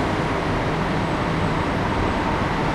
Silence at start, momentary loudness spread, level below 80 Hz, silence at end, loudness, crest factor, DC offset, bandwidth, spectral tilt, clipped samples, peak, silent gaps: 0 s; 1 LU; -34 dBFS; 0 s; -22 LUFS; 12 dB; under 0.1%; 13 kHz; -6.5 dB/octave; under 0.1%; -10 dBFS; none